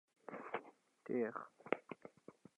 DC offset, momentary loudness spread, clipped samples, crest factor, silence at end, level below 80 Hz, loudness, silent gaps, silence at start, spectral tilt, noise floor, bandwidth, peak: under 0.1%; 19 LU; under 0.1%; 28 dB; 0.25 s; under -90 dBFS; -46 LUFS; none; 0.25 s; -7 dB/octave; -63 dBFS; 10.5 kHz; -18 dBFS